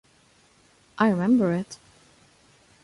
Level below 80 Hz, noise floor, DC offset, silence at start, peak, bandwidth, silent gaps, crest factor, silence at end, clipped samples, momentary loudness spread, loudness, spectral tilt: -64 dBFS; -60 dBFS; under 0.1%; 0.95 s; -8 dBFS; 11.5 kHz; none; 18 dB; 1.1 s; under 0.1%; 24 LU; -23 LUFS; -7.5 dB/octave